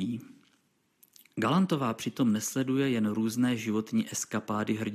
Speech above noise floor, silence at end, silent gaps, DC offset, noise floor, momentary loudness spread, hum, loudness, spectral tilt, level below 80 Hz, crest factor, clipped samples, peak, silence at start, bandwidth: 42 dB; 0 s; none; under 0.1%; -71 dBFS; 6 LU; none; -29 LUFS; -5 dB/octave; -76 dBFS; 16 dB; under 0.1%; -14 dBFS; 0 s; 15 kHz